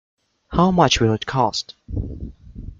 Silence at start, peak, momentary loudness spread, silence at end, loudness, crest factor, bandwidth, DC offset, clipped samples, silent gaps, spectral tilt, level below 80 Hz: 0.5 s; -2 dBFS; 20 LU; 0.05 s; -20 LUFS; 20 dB; 7.6 kHz; under 0.1%; under 0.1%; none; -5 dB/octave; -36 dBFS